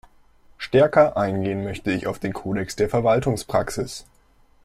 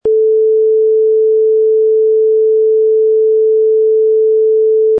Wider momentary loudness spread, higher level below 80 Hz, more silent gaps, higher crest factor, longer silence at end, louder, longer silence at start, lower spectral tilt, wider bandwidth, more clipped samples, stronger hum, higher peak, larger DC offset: first, 12 LU vs 0 LU; first, -48 dBFS vs -60 dBFS; neither; first, 20 dB vs 4 dB; first, 0.6 s vs 0 s; second, -22 LUFS vs -10 LUFS; first, 0.6 s vs 0.05 s; second, -6 dB/octave vs -10.5 dB/octave; first, 15 kHz vs 0.9 kHz; neither; neither; about the same, -4 dBFS vs -6 dBFS; neither